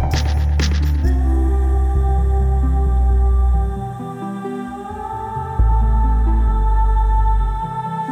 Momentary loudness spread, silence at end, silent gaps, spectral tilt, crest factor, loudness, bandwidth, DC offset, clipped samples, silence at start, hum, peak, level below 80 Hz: 10 LU; 0 s; none; -7 dB/octave; 10 dB; -19 LUFS; 7.4 kHz; under 0.1%; under 0.1%; 0 s; none; -6 dBFS; -16 dBFS